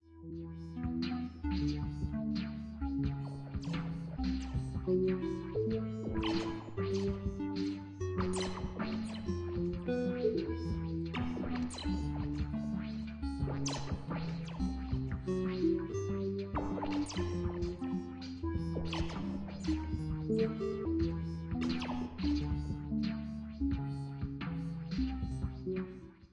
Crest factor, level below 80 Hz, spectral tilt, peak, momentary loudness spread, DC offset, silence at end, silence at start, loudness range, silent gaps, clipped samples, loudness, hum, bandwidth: 16 dB; -46 dBFS; -7 dB/octave; -20 dBFS; 6 LU; under 0.1%; 0.05 s; 0.05 s; 2 LU; none; under 0.1%; -37 LUFS; none; 10 kHz